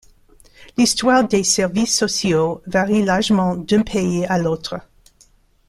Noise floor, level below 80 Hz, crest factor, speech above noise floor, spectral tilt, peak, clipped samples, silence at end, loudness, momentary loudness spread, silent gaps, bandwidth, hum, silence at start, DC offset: -54 dBFS; -46 dBFS; 16 dB; 37 dB; -4 dB/octave; -2 dBFS; under 0.1%; 0.9 s; -18 LUFS; 7 LU; none; 14 kHz; none; 0.6 s; under 0.1%